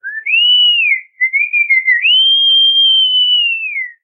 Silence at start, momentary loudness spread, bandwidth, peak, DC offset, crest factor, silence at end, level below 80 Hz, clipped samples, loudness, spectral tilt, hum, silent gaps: 0.05 s; 7 LU; 4.5 kHz; -2 dBFS; under 0.1%; 8 dB; 0.15 s; under -90 dBFS; under 0.1%; -8 LUFS; 6.5 dB/octave; none; none